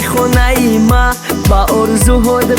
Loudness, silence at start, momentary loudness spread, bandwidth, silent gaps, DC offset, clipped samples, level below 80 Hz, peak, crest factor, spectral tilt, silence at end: -11 LUFS; 0 s; 2 LU; 19 kHz; none; under 0.1%; under 0.1%; -16 dBFS; 0 dBFS; 10 dB; -5 dB/octave; 0 s